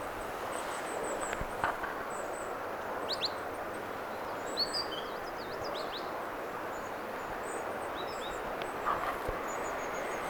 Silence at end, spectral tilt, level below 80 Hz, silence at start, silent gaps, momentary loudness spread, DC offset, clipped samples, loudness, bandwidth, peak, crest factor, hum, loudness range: 0 s; -3 dB/octave; -56 dBFS; 0 s; none; 6 LU; under 0.1%; under 0.1%; -37 LUFS; 19.5 kHz; -14 dBFS; 22 dB; none; 2 LU